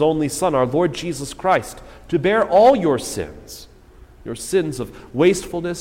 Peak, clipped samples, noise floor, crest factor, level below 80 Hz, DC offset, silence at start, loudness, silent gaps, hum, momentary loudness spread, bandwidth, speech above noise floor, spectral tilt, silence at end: -4 dBFS; under 0.1%; -45 dBFS; 16 dB; -44 dBFS; under 0.1%; 0 s; -19 LUFS; none; none; 22 LU; 16.5 kHz; 26 dB; -5 dB/octave; 0 s